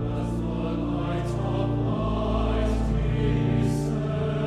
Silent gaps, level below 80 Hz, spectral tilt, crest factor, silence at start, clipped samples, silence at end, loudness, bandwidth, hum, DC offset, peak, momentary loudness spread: none; -32 dBFS; -8 dB/octave; 12 dB; 0 s; under 0.1%; 0 s; -26 LUFS; 11.5 kHz; none; under 0.1%; -14 dBFS; 4 LU